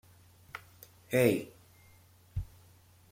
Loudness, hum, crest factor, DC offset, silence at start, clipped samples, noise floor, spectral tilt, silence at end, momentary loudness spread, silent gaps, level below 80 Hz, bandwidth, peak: -32 LUFS; none; 24 dB; under 0.1%; 0.55 s; under 0.1%; -60 dBFS; -6 dB/octave; 0.65 s; 25 LU; none; -54 dBFS; 16.5 kHz; -12 dBFS